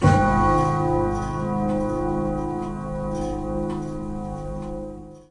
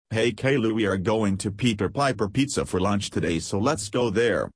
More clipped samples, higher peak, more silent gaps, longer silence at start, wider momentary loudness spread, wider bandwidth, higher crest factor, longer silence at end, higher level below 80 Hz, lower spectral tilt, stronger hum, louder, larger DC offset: neither; first, -6 dBFS vs -10 dBFS; neither; about the same, 0 s vs 0.1 s; first, 13 LU vs 3 LU; about the same, 11 kHz vs 11 kHz; about the same, 18 dB vs 14 dB; about the same, 0.1 s vs 0.05 s; first, -34 dBFS vs -50 dBFS; first, -8 dB/octave vs -5 dB/octave; first, 50 Hz at -40 dBFS vs none; about the same, -24 LUFS vs -24 LUFS; neither